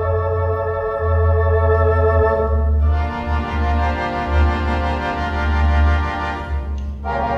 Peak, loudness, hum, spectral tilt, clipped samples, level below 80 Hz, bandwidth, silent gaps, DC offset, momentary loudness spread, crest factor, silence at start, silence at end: -4 dBFS; -19 LUFS; none; -8 dB/octave; under 0.1%; -20 dBFS; 6.2 kHz; none; under 0.1%; 8 LU; 12 dB; 0 s; 0 s